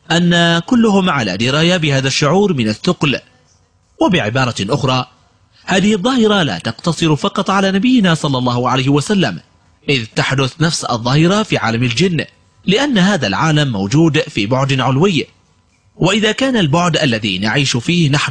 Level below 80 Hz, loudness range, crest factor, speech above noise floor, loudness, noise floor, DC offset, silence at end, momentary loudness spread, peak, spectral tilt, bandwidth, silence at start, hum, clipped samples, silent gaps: -46 dBFS; 2 LU; 12 dB; 41 dB; -14 LUFS; -54 dBFS; under 0.1%; 0 s; 5 LU; -2 dBFS; -5 dB/octave; 10.5 kHz; 0.1 s; none; under 0.1%; none